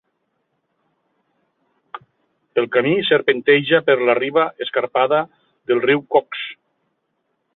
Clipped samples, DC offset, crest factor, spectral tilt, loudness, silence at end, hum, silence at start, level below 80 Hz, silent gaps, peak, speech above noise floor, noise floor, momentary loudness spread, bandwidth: under 0.1%; under 0.1%; 18 dB; -9 dB/octave; -18 LUFS; 1 s; none; 1.95 s; -66 dBFS; none; -2 dBFS; 54 dB; -71 dBFS; 19 LU; 4.2 kHz